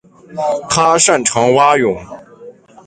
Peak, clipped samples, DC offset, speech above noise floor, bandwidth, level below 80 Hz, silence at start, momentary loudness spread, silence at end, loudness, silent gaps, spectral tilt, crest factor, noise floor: 0 dBFS; under 0.1%; under 0.1%; 25 dB; 9.6 kHz; -50 dBFS; 0.3 s; 12 LU; 0.35 s; -12 LUFS; none; -3 dB/octave; 14 dB; -38 dBFS